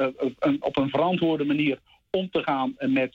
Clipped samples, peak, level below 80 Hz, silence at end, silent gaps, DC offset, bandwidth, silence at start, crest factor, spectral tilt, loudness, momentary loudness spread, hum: under 0.1%; -12 dBFS; -60 dBFS; 0.05 s; none; under 0.1%; 6.2 kHz; 0 s; 12 dB; -8 dB/octave; -25 LUFS; 5 LU; none